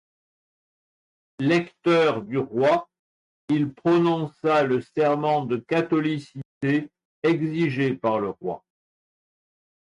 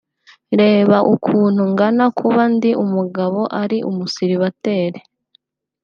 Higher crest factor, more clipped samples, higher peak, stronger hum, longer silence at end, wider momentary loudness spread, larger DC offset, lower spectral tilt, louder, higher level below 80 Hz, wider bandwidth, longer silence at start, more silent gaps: about the same, 14 dB vs 14 dB; neither; second, -12 dBFS vs -2 dBFS; neither; first, 1.25 s vs 0.85 s; about the same, 9 LU vs 8 LU; neither; about the same, -7.5 dB/octave vs -7.5 dB/octave; second, -24 LUFS vs -16 LUFS; about the same, -66 dBFS vs -66 dBFS; first, 10.5 kHz vs 7 kHz; first, 1.4 s vs 0.5 s; first, 2.99-3.48 s, 6.45-6.61 s, 7.05-7.22 s vs none